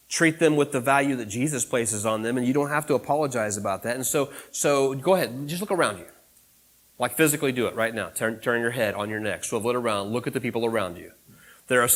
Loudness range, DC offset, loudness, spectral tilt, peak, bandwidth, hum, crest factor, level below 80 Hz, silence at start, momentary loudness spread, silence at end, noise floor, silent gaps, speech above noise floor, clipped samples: 3 LU; under 0.1%; -25 LUFS; -4 dB/octave; -6 dBFS; 16.5 kHz; none; 20 dB; -64 dBFS; 0.1 s; 7 LU; 0 s; -59 dBFS; none; 34 dB; under 0.1%